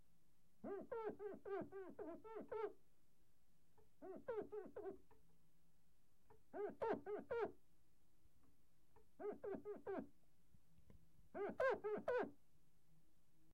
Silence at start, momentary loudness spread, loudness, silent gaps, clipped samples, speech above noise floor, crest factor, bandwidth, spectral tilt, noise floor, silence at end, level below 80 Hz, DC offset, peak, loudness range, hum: 0.65 s; 13 LU; -50 LUFS; none; under 0.1%; 32 dB; 20 dB; 16 kHz; -6.5 dB/octave; -81 dBFS; 1.2 s; -82 dBFS; under 0.1%; -30 dBFS; 8 LU; none